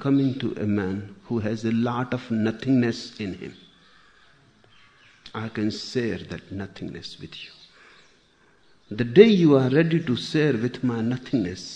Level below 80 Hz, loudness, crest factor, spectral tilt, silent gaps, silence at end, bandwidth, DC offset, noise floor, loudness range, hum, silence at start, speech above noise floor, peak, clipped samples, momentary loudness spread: -60 dBFS; -23 LUFS; 24 dB; -7 dB/octave; none; 0 s; 9.6 kHz; under 0.1%; -60 dBFS; 12 LU; none; 0 s; 37 dB; 0 dBFS; under 0.1%; 20 LU